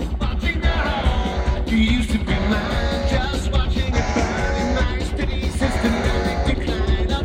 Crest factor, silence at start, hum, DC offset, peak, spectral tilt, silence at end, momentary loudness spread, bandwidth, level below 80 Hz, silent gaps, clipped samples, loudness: 14 dB; 0 s; none; under 0.1%; -6 dBFS; -6 dB/octave; 0 s; 3 LU; 11 kHz; -22 dBFS; none; under 0.1%; -21 LUFS